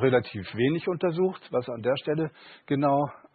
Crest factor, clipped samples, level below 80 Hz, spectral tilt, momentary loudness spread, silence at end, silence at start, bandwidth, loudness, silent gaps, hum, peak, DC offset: 18 dB; under 0.1%; -62 dBFS; -11 dB/octave; 7 LU; 0.2 s; 0 s; 4.8 kHz; -27 LUFS; none; none; -10 dBFS; under 0.1%